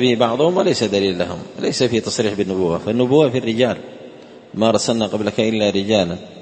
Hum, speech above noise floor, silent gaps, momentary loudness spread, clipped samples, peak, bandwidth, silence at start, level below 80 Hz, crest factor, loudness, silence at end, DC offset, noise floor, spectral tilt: none; 22 dB; none; 8 LU; under 0.1%; 0 dBFS; 8.8 kHz; 0 s; -54 dBFS; 18 dB; -18 LUFS; 0 s; under 0.1%; -39 dBFS; -5 dB/octave